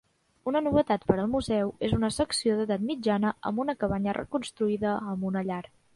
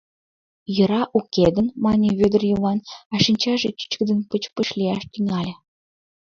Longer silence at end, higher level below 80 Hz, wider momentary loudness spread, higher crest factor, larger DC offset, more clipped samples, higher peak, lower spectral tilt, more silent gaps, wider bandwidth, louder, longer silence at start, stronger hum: second, 0.35 s vs 0.75 s; about the same, -50 dBFS vs -50 dBFS; second, 6 LU vs 9 LU; about the same, 20 dB vs 20 dB; neither; neither; second, -8 dBFS vs -2 dBFS; about the same, -5.5 dB/octave vs -6 dB/octave; second, none vs 3.05-3.10 s; first, 11.5 kHz vs 7.2 kHz; second, -28 LUFS vs -21 LUFS; second, 0.45 s vs 0.7 s; neither